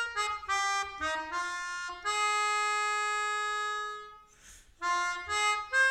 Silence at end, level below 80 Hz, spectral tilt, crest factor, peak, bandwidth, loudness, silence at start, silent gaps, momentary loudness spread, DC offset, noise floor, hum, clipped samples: 0 s; -62 dBFS; 0.5 dB/octave; 14 dB; -18 dBFS; 14 kHz; -31 LUFS; 0 s; none; 8 LU; under 0.1%; -56 dBFS; none; under 0.1%